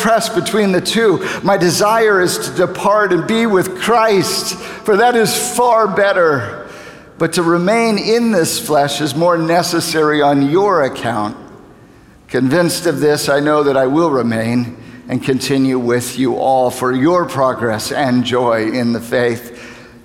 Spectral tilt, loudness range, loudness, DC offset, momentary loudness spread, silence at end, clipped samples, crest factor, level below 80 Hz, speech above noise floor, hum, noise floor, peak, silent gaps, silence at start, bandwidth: -4.5 dB/octave; 2 LU; -14 LUFS; under 0.1%; 8 LU; 0.15 s; under 0.1%; 12 dB; -52 dBFS; 29 dB; none; -43 dBFS; -2 dBFS; none; 0 s; 17.5 kHz